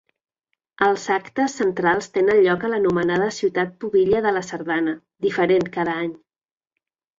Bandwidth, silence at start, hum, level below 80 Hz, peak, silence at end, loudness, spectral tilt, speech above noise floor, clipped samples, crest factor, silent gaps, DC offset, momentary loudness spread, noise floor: 7.8 kHz; 0.8 s; none; -58 dBFS; -4 dBFS; 1 s; -21 LUFS; -5.5 dB/octave; over 70 dB; under 0.1%; 18 dB; none; under 0.1%; 7 LU; under -90 dBFS